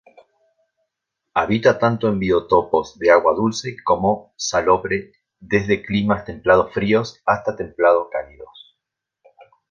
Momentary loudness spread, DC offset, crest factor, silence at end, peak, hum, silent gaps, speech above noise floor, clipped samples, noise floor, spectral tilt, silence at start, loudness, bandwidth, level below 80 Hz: 9 LU; under 0.1%; 18 dB; 1.25 s; 0 dBFS; none; none; 63 dB; under 0.1%; -81 dBFS; -5.5 dB/octave; 1.35 s; -19 LUFS; 7.4 kHz; -48 dBFS